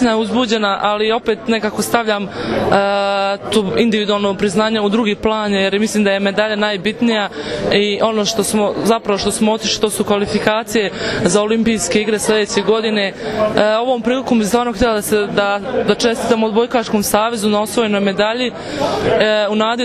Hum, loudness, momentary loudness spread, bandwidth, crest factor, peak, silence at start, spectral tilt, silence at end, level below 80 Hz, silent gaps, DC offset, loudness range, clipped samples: none; -16 LUFS; 3 LU; 14 kHz; 16 dB; 0 dBFS; 0 s; -4 dB/octave; 0 s; -44 dBFS; none; under 0.1%; 1 LU; under 0.1%